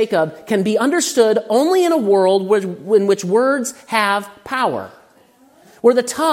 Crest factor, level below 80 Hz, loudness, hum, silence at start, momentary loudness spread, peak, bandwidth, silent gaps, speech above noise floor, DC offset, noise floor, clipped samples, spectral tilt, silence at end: 16 dB; -66 dBFS; -16 LUFS; none; 0 s; 6 LU; 0 dBFS; 16.5 kHz; none; 35 dB; under 0.1%; -51 dBFS; under 0.1%; -4 dB/octave; 0 s